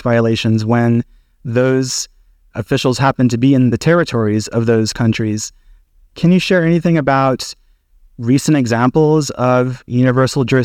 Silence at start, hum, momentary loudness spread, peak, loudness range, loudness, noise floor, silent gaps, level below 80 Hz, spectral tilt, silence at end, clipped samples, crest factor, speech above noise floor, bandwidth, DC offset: 0.05 s; none; 10 LU; -2 dBFS; 1 LU; -14 LUFS; -49 dBFS; none; -44 dBFS; -6 dB/octave; 0 s; under 0.1%; 12 dB; 36 dB; 15.5 kHz; under 0.1%